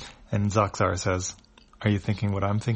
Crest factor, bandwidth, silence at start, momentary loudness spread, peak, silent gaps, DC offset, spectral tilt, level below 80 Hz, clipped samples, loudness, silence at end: 18 dB; 8.8 kHz; 0 s; 6 LU; -8 dBFS; none; under 0.1%; -5.5 dB/octave; -50 dBFS; under 0.1%; -27 LUFS; 0 s